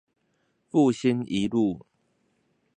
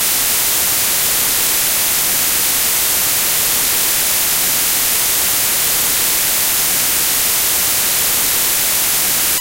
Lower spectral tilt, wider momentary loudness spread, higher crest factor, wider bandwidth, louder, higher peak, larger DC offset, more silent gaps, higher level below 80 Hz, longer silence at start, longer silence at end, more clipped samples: first, -6.5 dB/octave vs 0.5 dB/octave; first, 6 LU vs 0 LU; about the same, 18 dB vs 14 dB; second, 9.6 kHz vs 16.5 kHz; second, -25 LUFS vs -12 LUFS; second, -10 dBFS vs 0 dBFS; neither; neither; second, -62 dBFS vs -42 dBFS; first, 0.75 s vs 0 s; first, 1 s vs 0 s; neither